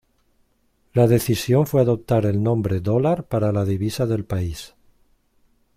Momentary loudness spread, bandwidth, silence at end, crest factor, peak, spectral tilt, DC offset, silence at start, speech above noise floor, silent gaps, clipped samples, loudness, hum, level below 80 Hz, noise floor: 9 LU; 16.5 kHz; 1.1 s; 18 dB; -4 dBFS; -7 dB/octave; under 0.1%; 0.95 s; 45 dB; none; under 0.1%; -21 LUFS; none; -46 dBFS; -64 dBFS